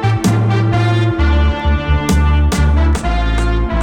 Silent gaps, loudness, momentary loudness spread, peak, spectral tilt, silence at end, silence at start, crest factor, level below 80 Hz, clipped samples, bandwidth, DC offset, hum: none; -14 LUFS; 3 LU; -2 dBFS; -6.5 dB/octave; 0 s; 0 s; 12 dB; -16 dBFS; under 0.1%; 12.5 kHz; under 0.1%; none